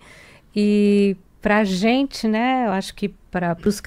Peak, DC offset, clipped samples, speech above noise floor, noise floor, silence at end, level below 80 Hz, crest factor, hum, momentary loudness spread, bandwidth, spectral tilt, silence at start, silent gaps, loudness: -6 dBFS; under 0.1%; under 0.1%; 27 dB; -47 dBFS; 0.05 s; -48 dBFS; 14 dB; none; 10 LU; 14.5 kHz; -6 dB/octave; 0.55 s; none; -20 LUFS